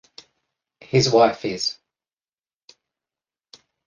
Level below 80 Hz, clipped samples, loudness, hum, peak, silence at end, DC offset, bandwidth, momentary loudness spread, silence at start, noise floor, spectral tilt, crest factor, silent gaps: -60 dBFS; under 0.1%; -20 LUFS; none; -4 dBFS; 2.15 s; under 0.1%; 10 kHz; 10 LU; 0.95 s; under -90 dBFS; -4.5 dB/octave; 22 dB; none